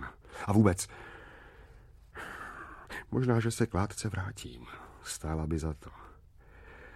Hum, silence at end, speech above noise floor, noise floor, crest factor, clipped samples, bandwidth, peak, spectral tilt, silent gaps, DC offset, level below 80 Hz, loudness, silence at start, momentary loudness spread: none; 0 s; 25 dB; -56 dBFS; 24 dB; under 0.1%; 15 kHz; -10 dBFS; -6 dB/octave; none; under 0.1%; -50 dBFS; -33 LUFS; 0 s; 23 LU